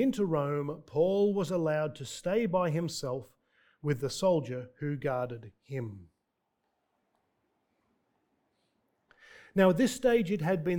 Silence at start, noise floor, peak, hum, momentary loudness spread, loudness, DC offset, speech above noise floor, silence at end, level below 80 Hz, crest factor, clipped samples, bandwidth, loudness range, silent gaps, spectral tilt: 0 s; -82 dBFS; -10 dBFS; none; 13 LU; -31 LUFS; under 0.1%; 52 dB; 0 s; -64 dBFS; 22 dB; under 0.1%; 18.5 kHz; 13 LU; none; -6 dB/octave